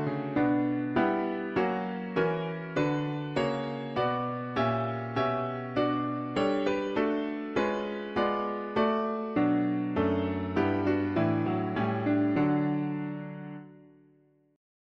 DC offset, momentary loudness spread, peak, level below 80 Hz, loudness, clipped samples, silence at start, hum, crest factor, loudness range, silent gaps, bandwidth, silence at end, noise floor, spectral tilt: under 0.1%; 6 LU; -14 dBFS; -60 dBFS; -29 LUFS; under 0.1%; 0 s; none; 16 dB; 2 LU; none; 7.8 kHz; 1.1 s; -64 dBFS; -8 dB/octave